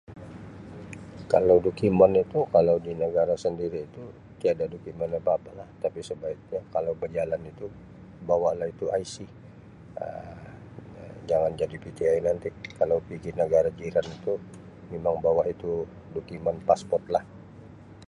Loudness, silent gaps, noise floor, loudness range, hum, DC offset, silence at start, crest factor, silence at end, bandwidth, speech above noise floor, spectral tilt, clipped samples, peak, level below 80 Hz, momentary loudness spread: -27 LUFS; none; -47 dBFS; 9 LU; none; under 0.1%; 0.1 s; 22 dB; 0.05 s; 11 kHz; 21 dB; -7 dB/octave; under 0.1%; -6 dBFS; -54 dBFS; 22 LU